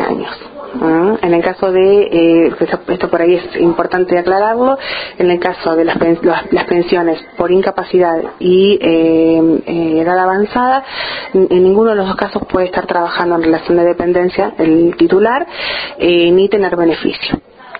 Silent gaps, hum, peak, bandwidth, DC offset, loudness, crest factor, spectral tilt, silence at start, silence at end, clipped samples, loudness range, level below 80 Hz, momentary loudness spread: none; none; 0 dBFS; 5 kHz; under 0.1%; -12 LUFS; 12 dB; -9.5 dB/octave; 0 s; 0 s; under 0.1%; 2 LU; -44 dBFS; 8 LU